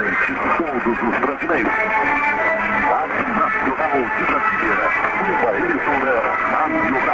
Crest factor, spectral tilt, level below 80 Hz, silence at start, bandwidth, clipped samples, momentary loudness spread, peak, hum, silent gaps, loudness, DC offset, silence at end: 14 dB; -6.5 dB/octave; -46 dBFS; 0 s; 7.8 kHz; under 0.1%; 2 LU; -4 dBFS; none; none; -18 LUFS; under 0.1%; 0 s